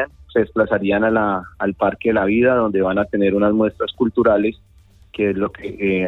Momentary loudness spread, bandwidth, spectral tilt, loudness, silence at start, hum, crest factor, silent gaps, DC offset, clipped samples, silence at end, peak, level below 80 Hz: 7 LU; 4.1 kHz; -9 dB/octave; -18 LUFS; 0 s; none; 14 dB; none; under 0.1%; under 0.1%; 0 s; -4 dBFS; -46 dBFS